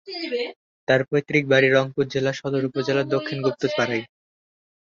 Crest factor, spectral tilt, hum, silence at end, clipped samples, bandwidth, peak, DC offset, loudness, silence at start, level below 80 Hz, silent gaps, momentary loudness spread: 20 dB; -6 dB/octave; none; 0.85 s; under 0.1%; 7.4 kHz; -4 dBFS; under 0.1%; -22 LUFS; 0.05 s; -62 dBFS; 0.56-0.87 s; 11 LU